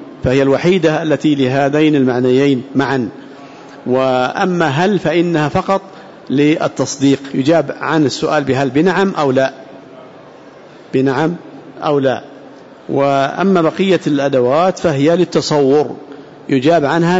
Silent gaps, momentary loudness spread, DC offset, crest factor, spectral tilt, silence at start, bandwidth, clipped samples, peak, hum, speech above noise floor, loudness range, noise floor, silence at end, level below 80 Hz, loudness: none; 8 LU; under 0.1%; 12 dB; -6 dB/octave; 0 s; 8 kHz; under 0.1%; -2 dBFS; none; 25 dB; 4 LU; -38 dBFS; 0 s; -50 dBFS; -14 LUFS